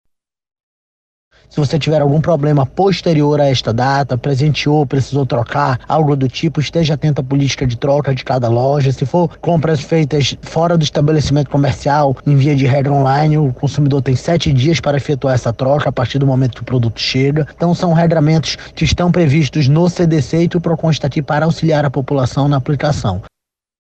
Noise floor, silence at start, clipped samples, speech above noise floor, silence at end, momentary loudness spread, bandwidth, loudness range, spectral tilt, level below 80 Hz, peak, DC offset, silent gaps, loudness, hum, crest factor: under -90 dBFS; 1.55 s; under 0.1%; over 77 dB; 0.55 s; 4 LU; 8.2 kHz; 2 LU; -6.5 dB/octave; -38 dBFS; -2 dBFS; under 0.1%; none; -14 LUFS; none; 12 dB